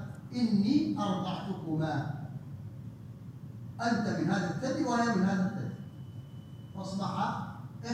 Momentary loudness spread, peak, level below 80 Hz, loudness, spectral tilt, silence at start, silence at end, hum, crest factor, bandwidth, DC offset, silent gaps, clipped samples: 18 LU; -16 dBFS; -66 dBFS; -32 LUFS; -6.5 dB/octave; 0 s; 0 s; none; 18 dB; 10 kHz; under 0.1%; none; under 0.1%